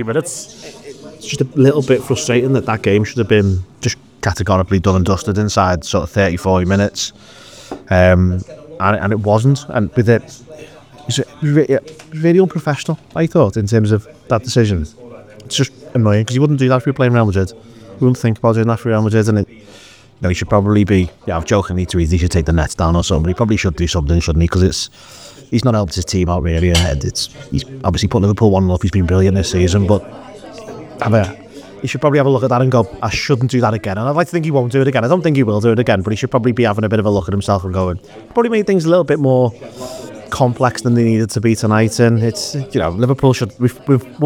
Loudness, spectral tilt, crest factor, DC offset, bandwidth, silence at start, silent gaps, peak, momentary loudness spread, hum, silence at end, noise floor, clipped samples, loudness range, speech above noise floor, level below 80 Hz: -15 LUFS; -6 dB/octave; 14 dB; 0.1%; 15 kHz; 0 s; none; 0 dBFS; 10 LU; none; 0 s; -42 dBFS; under 0.1%; 2 LU; 27 dB; -34 dBFS